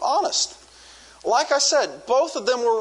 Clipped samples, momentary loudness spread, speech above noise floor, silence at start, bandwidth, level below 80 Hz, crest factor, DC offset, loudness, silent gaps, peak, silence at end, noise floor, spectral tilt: under 0.1%; 5 LU; 26 dB; 0 s; 11 kHz; -64 dBFS; 16 dB; under 0.1%; -21 LUFS; none; -6 dBFS; 0 s; -47 dBFS; 0 dB/octave